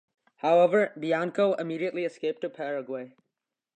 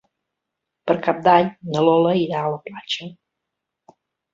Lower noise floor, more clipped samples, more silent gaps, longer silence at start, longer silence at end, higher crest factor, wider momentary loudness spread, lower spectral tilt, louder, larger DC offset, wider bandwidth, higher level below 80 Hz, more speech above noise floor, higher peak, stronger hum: first, -85 dBFS vs -81 dBFS; neither; neither; second, 0.45 s vs 0.85 s; second, 0.7 s vs 1.2 s; about the same, 18 dB vs 20 dB; about the same, 13 LU vs 13 LU; about the same, -6.5 dB/octave vs -6.5 dB/octave; second, -27 LUFS vs -19 LUFS; neither; first, 8.8 kHz vs 7.6 kHz; second, -84 dBFS vs -64 dBFS; second, 58 dB vs 62 dB; second, -10 dBFS vs -2 dBFS; neither